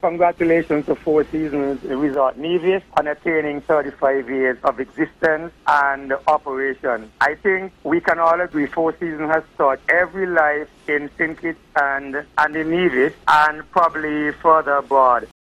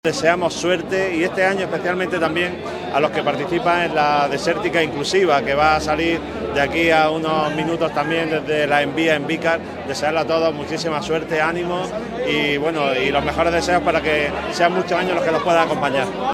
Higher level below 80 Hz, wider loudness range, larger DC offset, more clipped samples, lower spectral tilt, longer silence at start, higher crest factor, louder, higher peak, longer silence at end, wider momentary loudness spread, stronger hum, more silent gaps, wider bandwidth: second, -52 dBFS vs -44 dBFS; about the same, 2 LU vs 2 LU; neither; neither; first, -6.5 dB/octave vs -4.5 dB/octave; about the same, 0.05 s vs 0.05 s; about the same, 18 dB vs 18 dB; about the same, -19 LUFS vs -19 LUFS; about the same, -2 dBFS vs 0 dBFS; first, 0.3 s vs 0 s; about the same, 7 LU vs 6 LU; neither; neither; second, 13 kHz vs 15.5 kHz